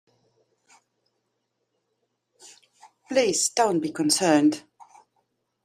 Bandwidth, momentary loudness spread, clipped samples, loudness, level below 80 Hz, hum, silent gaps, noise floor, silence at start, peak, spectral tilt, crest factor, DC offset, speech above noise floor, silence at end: 15 kHz; 6 LU; under 0.1%; -22 LUFS; -74 dBFS; none; none; -77 dBFS; 3.1 s; -6 dBFS; -3 dB/octave; 20 dB; under 0.1%; 55 dB; 1.05 s